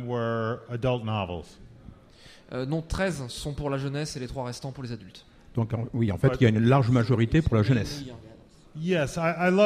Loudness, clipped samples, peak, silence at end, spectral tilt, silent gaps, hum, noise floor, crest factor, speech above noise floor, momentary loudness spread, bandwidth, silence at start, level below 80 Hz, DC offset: -27 LUFS; under 0.1%; -8 dBFS; 0 s; -7 dB/octave; none; none; -52 dBFS; 18 dB; 26 dB; 16 LU; 13 kHz; 0 s; -44 dBFS; under 0.1%